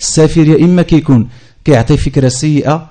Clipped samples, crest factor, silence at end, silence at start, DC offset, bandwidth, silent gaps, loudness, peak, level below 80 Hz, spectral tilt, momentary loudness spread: 0.9%; 10 dB; 0.05 s; 0 s; under 0.1%; 9.4 kHz; none; -10 LUFS; 0 dBFS; -26 dBFS; -6 dB/octave; 5 LU